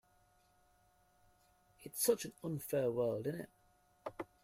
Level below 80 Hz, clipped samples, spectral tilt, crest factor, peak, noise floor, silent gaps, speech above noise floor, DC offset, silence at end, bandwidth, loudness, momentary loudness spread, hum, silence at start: -76 dBFS; under 0.1%; -4.5 dB/octave; 22 dB; -18 dBFS; -72 dBFS; none; 35 dB; under 0.1%; 0.2 s; 16 kHz; -38 LUFS; 17 LU; none; 1.8 s